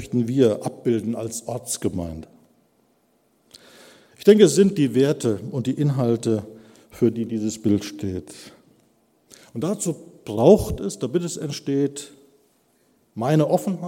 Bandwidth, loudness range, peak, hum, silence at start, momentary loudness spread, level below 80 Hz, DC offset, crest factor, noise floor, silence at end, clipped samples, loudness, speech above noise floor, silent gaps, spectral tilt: 16.5 kHz; 8 LU; 0 dBFS; none; 0 s; 18 LU; -50 dBFS; under 0.1%; 22 dB; -64 dBFS; 0 s; under 0.1%; -22 LUFS; 43 dB; none; -6 dB/octave